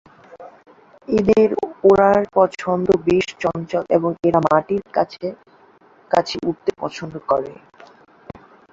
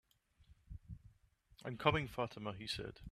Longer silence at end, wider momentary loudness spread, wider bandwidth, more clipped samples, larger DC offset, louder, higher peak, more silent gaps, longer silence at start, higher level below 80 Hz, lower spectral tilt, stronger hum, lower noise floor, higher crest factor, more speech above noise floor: first, 1.2 s vs 0.05 s; second, 10 LU vs 22 LU; second, 7.8 kHz vs 14.5 kHz; neither; neither; first, -19 LUFS vs -40 LUFS; first, -2 dBFS vs -14 dBFS; neither; about the same, 0.35 s vs 0.4 s; first, -52 dBFS vs -60 dBFS; about the same, -6.5 dB/octave vs -5.5 dB/octave; neither; second, -51 dBFS vs -70 dBFS; second, 18 dB vs 28 dB; about the same, 33 dB vs 30 dB